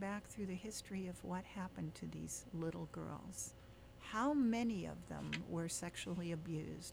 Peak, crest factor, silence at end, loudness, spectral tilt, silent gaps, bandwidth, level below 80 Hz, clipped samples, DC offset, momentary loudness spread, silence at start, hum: -28 dBFS; 16 dB; 0 s; -44 LUFS; -5 dB/octave; none; over 20 kHz; -64 dBFS; under 0.1%; under 0.1%; 11 LU; 0 s; none